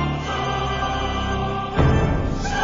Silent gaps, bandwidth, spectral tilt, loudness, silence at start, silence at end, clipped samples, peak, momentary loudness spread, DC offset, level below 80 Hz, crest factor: none; 7.6 kHz; -6 dB/octave; -22 LUFS; 0 s; 0 s; under 0.1%; -4 dBFS; 5 LU; under 0.1%; -28 dBFS; 16 dB